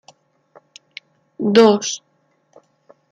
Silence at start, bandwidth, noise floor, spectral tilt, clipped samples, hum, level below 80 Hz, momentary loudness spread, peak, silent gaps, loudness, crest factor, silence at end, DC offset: 1.4 s; 9.2 kHz; -62 dBFS; -4.5 dB/octave; under 0.1%; none; -68 dBFS; 27 LU; -2 dBFS; none; -16 LUFS; 18 dB; 1.15 s; under 0.1%